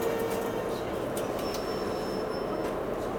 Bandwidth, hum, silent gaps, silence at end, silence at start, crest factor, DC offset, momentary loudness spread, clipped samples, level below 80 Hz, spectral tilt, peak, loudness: over 20 kHz; none; none; 0 s; 0 s; 14 dB; under 0.1%; 2 LU; under 0.1%; -50 dBFS; -5 dB/octave; -18 dBFS; -32 LUFS